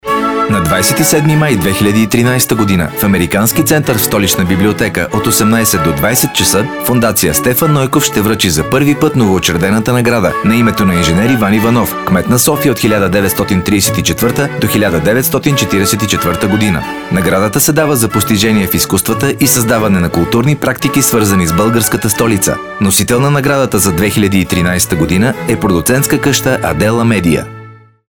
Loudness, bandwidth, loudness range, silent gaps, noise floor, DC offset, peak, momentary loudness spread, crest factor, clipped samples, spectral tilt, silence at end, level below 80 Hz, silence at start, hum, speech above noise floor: -10 LUFS; over 20 kHz; 1 LU; none; -34 dBFS; 0.7%; 0 dBFS; 3 LU; 10 dB; under 0.1%; -4.5 dB/octave; 0.35 s; -34 dBFS; 0.05 s; none; 24 dB